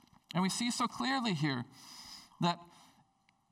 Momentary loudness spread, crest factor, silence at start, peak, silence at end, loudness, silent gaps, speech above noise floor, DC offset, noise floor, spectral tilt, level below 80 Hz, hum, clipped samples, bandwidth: 16 LU; 18 dB; 0.35 s; -20 dBFS; 0.85 s; -35 LUFS; none; 38 dB; under 0.1%; -72 dBFS; -4 dB/octave; -76 dBFS; none; under 0.1%; 16 kHz